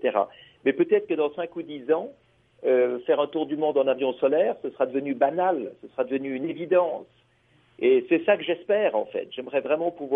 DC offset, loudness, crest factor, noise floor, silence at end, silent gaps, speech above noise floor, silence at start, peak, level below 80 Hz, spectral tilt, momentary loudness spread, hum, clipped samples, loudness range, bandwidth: under 0.1%; -25 LUFS; 18 dB; -62 dBFS; 0 s; none; 38 dB; 0 s; -8 dBFS; -76 dBFS; -8.5 dB/octave; 9 LU; none; under 0.1%; 2 LU; 3.8 kHz